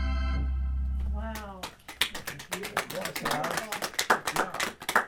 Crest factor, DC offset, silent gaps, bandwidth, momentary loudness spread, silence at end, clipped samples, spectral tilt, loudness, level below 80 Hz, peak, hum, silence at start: 26 dB; under 0.1%; none; 17.5 kHz; 12 LU; 0 s; under 0.1%; -3.5 dB/octave; -31 LUFS; -36 dBFS; -6 dBFS; none; 0 s